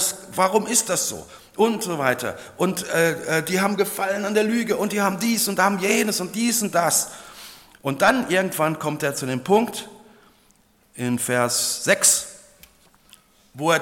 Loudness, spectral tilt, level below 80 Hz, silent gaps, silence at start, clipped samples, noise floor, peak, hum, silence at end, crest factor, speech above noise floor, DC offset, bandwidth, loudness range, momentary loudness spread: -21 LUFS; -3 dB/octave; -64 dBFS; none; 0 s; under 0.1%; -59 dBFS; -2 dBFS; none; 0 s; 20 dB; 37 dB; under 0.1%; 17.5 kHz; 2 LU; 12 LU